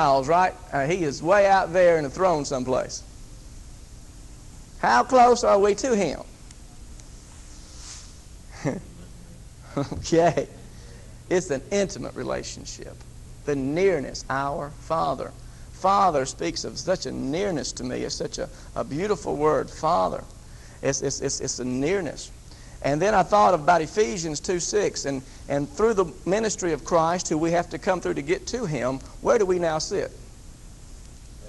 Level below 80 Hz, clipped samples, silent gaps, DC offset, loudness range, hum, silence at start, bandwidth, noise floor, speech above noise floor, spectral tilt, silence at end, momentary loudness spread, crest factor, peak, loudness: -44 dBFS; under 0.1%; none; under 0.1%; 6 LU; none; 0 s; 12 kHz; -44 dBFS; 20 dB; -4.5 dB/octave; 0 s; 20 LU; 18 dB; -6 dBFS; -24 LUFS